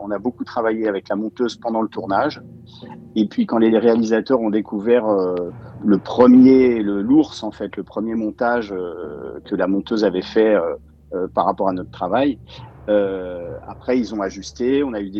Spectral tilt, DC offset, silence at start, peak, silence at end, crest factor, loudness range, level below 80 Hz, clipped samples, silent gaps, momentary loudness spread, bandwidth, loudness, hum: -7 dB/octave; under 0.1%; 0 s; -2 dBFS; 0 s; 18 dB; 7 LU; -50 dBFS; under 0.1%; none; 15 LU; 7.2 kHz; -19 LUFS; none